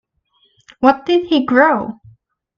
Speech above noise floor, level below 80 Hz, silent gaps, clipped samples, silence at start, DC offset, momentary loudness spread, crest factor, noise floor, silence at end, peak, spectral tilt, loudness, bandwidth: 47 dB; -56 dBFS; none; under 0.1%; 0.8 s; under 0.1%; 7 LU; 16 dB; -61 dBFS; 0.65 s; 0 dBFS; -6 dB/octave; -14 LUFS; 7 kHz